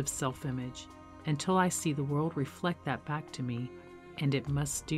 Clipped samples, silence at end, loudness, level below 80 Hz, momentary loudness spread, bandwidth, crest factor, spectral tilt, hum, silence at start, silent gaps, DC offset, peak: under 0.1%; 0 s; -34 LUFS; -58 dBFS; 14 LU; 16 kHz; 18 dB; -5 dB/octave; none; 0 s; none; under 0.1%; -16 dBFS